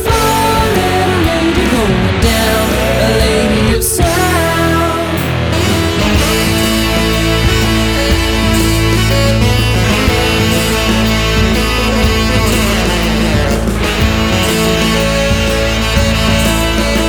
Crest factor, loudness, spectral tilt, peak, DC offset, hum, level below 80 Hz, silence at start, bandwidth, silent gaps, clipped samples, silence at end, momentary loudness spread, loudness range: 10 dB; -12 LUFS; -4.5 dB/octave; 0 dBFS; under 0.1%; none; -18 dBFS; 0 s; over 20 kHz; none; under 0.1%; 0 s; 2 LU; 1 LU